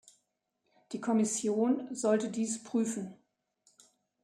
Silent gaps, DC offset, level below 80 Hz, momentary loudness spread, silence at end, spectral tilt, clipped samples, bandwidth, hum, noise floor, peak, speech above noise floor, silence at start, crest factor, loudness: none; under 0.1%; -82 dBFS; 10 LU; 1.1 s; -5 dB/octave; under 0.1%; 13.5 kHz; none; -81 dBFS; -16 dBFS; 50 dB; 0.9 s; 18 dB; -32 LUFS